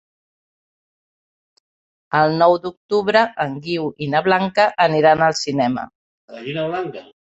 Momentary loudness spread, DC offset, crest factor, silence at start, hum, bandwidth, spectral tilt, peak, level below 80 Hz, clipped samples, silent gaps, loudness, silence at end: 12 LU; under 0.1%; 18 dB; 2.1 s; none; 8.2 kHz; -5 dB/octave; -2 dBFS; -60 dBFS; under 0.1%; 2.77-2.89 s, 5.95-6.28 s; -18 LUFS; 0.2 s